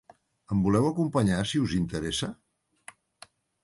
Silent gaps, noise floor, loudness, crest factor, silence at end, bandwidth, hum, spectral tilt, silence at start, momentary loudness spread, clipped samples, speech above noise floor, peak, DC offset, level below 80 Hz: none; -56 dBFS; -27 LUFS; 16 dB; 1.3 s; 11.5 kHz; none; -6 dB/octave; 0.5 s; 7 LU; under 0.1%; 30 dB; -12 dBFS; under 0.1%; -50 dBFS